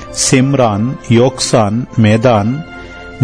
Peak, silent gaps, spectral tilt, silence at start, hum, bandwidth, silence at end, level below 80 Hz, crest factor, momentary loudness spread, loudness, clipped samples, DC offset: 0 dBFS; none; -5 dB/octave; 0 s; none; 10.5 kHz; 0 s; -40 dBFS; 12 dB; 14 LU; -12 LUFS; under 0.1%; 0.8%